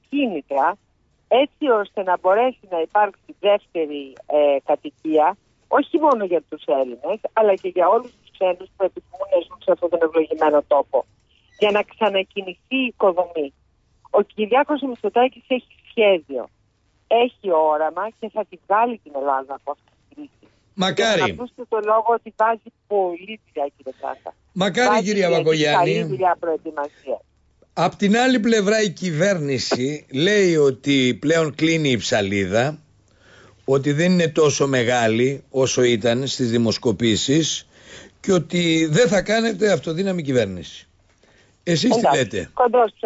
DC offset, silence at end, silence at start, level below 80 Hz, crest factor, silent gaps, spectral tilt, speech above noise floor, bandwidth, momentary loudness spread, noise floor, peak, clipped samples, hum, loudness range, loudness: under 0.1%; 0.15 s; 0.1 s; -58 dBFS; 14 dB; none; -5 dB/octave; 43 dB; 8 kHz; 12 LU; -63 dBFS; -6 dBFS; under 0.1%; none; 3 LU; -20 LUFS